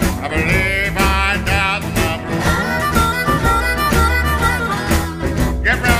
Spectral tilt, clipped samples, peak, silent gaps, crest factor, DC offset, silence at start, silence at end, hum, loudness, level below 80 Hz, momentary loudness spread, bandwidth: -4.5 dB/octave; under 0.1%; 0 dBFS; none; 16 dB; under 0.1%; 0 s; 0 s; none; -16 LUFS; -22 dBFS; 4 LU; 15.5 kHz